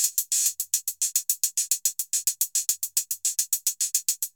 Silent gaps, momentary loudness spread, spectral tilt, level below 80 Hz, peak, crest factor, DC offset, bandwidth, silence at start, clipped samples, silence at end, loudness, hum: none; 3 LU; 8 dB/octave; -86 dBFS; -4 dBFS; 22 dB; under 0.1%; over 20 kHz; 0 s; under 0.1%; 0.05 s; -24 LUFS; none